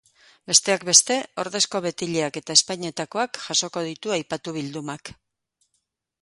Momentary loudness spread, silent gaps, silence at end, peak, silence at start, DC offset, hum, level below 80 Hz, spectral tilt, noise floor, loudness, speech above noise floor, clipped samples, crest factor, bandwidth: 15 LU; none; 1.1 s; 0 dBFS; 0.5 s; under 0.1%; none; -66 dBFS; -1.5 dB/octave; -75 dBFS; -21 LUFS; 51 dB; under 0.1%; 26 dB; 16 kHz